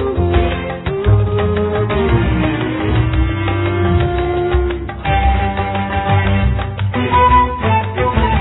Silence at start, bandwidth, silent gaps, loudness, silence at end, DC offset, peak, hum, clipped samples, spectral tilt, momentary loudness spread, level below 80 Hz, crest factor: 0 s; 4.1 kHz; none; -16 LUFS; 0 s; under 0.1%; 0 dBFS; none; under 0.1%; -11 dB/octave; 6 LU; -22 dBFS; 14 dB